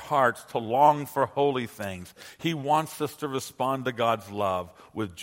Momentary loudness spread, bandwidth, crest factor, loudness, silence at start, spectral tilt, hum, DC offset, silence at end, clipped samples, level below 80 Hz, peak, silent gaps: 14 LU; 16.5 kHz; 20 dB; -27 LUFS; 0 s; -5 dB/octave; none; under 0.1%; 0 s; under 0.1%; -66 dBFS; -6 dBFS; none